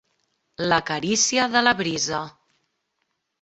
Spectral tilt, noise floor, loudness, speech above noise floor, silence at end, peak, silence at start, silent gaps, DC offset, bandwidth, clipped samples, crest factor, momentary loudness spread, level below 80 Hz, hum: -2 dB/octave; -76 dBFS; -21 LUFS; 54 dB; 1.1 s; -2 dBFS; 0.6 s; none; under 0.1%; 8.4 kHz; under 0.1%; 22 dB; 11 LU; -60 dBFS; none